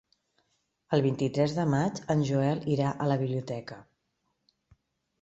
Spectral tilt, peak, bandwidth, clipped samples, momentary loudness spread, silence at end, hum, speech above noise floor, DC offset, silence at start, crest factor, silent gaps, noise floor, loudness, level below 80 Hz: -7.5 dB/octave; -10 dBFS; 8 kHz; under 0.1%; 11 LU; 1.4 s; none; 51 dB; under 0.1%; 0.9 s; 20 dB; none; -78 dBFS; -29 LUFS; -64 dBFS